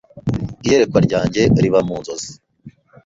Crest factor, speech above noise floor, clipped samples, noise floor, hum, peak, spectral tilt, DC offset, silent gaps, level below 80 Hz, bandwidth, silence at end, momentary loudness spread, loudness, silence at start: 16 dB; 28 dB; under 0.1%; -44 dBFS; none; -2 dBFS; -6 dB/octave; under 0.1%; none; -40 dBFS; 7.8 kHz; 0.35 s; 14 LU; -17 LUFS; 0.15 s